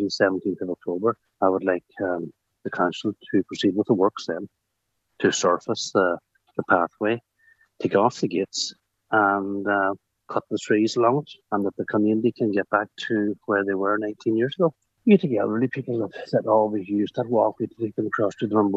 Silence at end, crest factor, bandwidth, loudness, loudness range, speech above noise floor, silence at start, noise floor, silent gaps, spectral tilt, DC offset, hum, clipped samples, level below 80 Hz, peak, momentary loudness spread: 0 s; 20 dB; 8.2 kHz; -24 LUFS; 2 LU; 54 dB; 0 s; -77 dBFS; none; -5.5 dB/octave; under 0.1%; none; under 0.1%; -72 dBFS; -4 dBFS; 10 LU